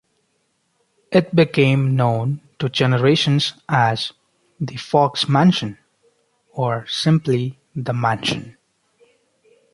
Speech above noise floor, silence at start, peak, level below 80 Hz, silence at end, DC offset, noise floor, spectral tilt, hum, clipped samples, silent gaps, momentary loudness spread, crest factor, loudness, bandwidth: 50 dB; 1.1 s; -2 dBFS; -56 dBFS; 1.25 s; under 0.1%; -67 dBFS; -6 dB/octave; none; under 0.1%; none; 13 LU; 18 dB; -19 LUFS; 11.5 kHz